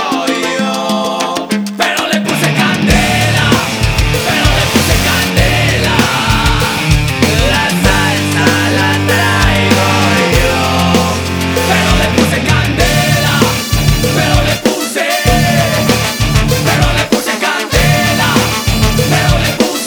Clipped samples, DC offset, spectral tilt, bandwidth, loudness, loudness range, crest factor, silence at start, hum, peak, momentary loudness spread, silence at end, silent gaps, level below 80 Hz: under 0.1%; under 0.1%; -4 dB/octave; over 20 kHz; -11 LUFS; 1 LU; 12 dB; 0 s; none; 0 dBFS; 4 LU; 0 s; none; -22 dBFS